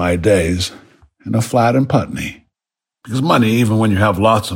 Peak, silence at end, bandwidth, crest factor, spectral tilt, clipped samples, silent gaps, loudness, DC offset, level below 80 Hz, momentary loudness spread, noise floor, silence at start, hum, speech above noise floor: 0 dBFS; 0 s; 16.5 kHz; 14 dB; -6 dB/octave; under 0.1%; none; -15 LUFS; under 0.1%; -40 dBFS; 11 LU; -87 dBFS; 0 s; none; 72 dB